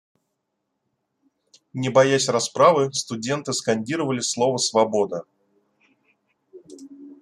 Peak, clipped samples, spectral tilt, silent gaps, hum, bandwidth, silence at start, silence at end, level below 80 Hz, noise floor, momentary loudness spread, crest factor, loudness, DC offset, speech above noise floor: -2 dBFS; under 0.1%; -4 dB/octave; none; none; 12.5 kHz; 1.75 s; 0.05 s; -68 dBFS; -78 dBFS; 11 LU; 22 dB; -21 LUFS; under 0.1%; 56 dB